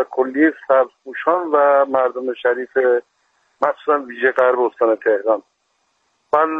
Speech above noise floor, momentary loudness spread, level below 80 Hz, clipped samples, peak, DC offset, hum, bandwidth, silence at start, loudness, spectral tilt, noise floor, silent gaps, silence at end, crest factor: 50 dB; 7 LU; -70 dBFS; under 0.1%; 0 dBFS; under 0.1%; none; 4.8 kHz; 0 s; -18 LUFS; -6.5 dB/octave; -67 dBFS; none; 0 s; 18 dB